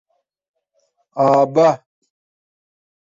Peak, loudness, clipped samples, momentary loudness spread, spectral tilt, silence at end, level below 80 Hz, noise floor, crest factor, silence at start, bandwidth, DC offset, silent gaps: -4 dBFS; -15 LUFS; under 0.1%; 15 LU; -7 dB/octave; 1.4 s; -66 dBFS; -67 dBFS; 18 dB; 1.15 s; 7.6 kHz; under 0.1%; none